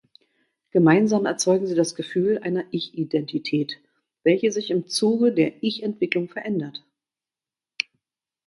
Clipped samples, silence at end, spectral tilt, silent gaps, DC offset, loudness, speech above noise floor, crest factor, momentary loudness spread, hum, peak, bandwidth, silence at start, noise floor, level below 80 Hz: under 0.1%; 1.7 s; -5 dB/octave; none; under 0.1%; -23 LUFS; over 68 dB; 20 dB; 11 LU; none; -4 dBFS; 11.5 kHz; 0.75 s; under -90 dBFS; -70 dBFS